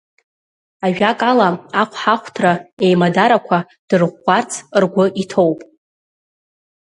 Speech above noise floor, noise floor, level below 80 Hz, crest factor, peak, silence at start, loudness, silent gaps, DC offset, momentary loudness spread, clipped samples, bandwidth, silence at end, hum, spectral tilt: over 75 dB; under -90 dBFS; -62 dBFS; 16 dB; 0 dBFS; 0.8 s; -16 LUFS; 2.73-2.77 s, 3.79-3.88 s; under 0.1%; 6 LU; under 0.1%; 11 kHz; 1.2 s; none; -5.5 dB/octave